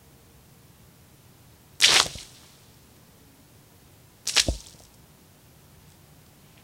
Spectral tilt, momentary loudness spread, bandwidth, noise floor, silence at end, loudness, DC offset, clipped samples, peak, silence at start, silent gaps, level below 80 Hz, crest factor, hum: 0 dB/octave; 27 LU; 16.5 kHz; -54 dBFS; 2.05 s; -21 LUFS; under 0.1%; under 0.1%; 0 dBFS; 1.8 s; none; -46 dBFS; 30 dB; none